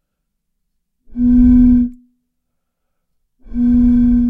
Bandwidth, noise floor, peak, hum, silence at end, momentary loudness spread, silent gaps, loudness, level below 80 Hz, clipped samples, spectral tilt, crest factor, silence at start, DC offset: 2.4 kHz; -72 dBFS; 0 dBFS; none; 0 s; 15 LU; none; -12 LUFS; -26 dBFS; under 0.1%; -11 dB/octave; 14 dB; 1.15 s; under 0.1%